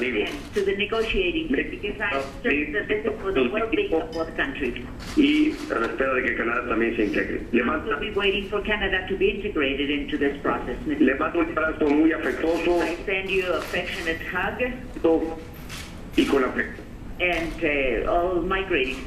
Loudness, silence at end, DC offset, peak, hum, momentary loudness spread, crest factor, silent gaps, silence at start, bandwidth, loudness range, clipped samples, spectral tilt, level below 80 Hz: -24 LUFS; 0 s; under 0.1%; -6 dBFS; none; 6 LU; 18 dB; none; 0 s; 14 kHz; 2 LU; under 0.1%; -5.5 dB/octave; -40 dBFS